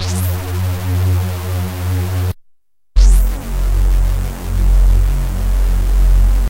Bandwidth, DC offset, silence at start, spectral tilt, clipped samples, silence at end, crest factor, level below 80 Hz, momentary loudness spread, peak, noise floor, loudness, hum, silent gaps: 16 kHz; 0.2%; 0 s; -6 dB/octave; under 0.1%; 0 s; 14 dB; -14 dBFS; 7 LU; 0 dBFS; -55 dBFS; -17 LUFS; none; none